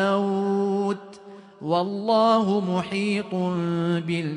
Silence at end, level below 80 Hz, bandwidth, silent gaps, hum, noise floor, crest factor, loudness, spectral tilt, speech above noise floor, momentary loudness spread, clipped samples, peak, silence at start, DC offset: 0 s; -68 dBFS; 10.5 kHz; none; none; -45 dBFS; 16 dB; -24 LUFS; -7 dB/octave; 22 dB; 8 LU; under 0.1%; -8 dBFS; 0 s; under 0.1%